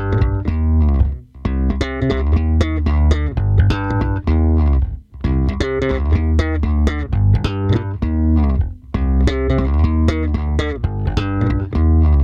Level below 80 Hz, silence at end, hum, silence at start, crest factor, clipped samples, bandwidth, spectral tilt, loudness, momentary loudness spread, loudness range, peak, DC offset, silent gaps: -18 dBFS; 0 s; none; 0 s; 16 dB; under 0.1%; 7 kHz; -8.5 dB/octave; -18 LUFS; 5 LU; 1 LU; 0 dBFS; under 0.1%; none